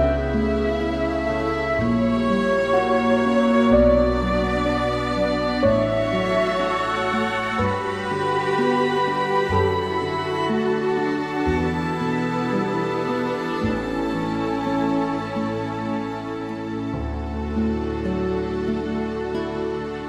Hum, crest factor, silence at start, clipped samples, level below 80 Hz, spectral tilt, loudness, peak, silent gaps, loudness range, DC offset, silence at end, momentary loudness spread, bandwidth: none; 16 dB; 0 s; under 0.1%; -36 dBFS; -7 dB/octave; -22 LUFS; -6 dBFS; none; 7 LU; under 0.1%; 0 s; 7 LU; 11.5 kHz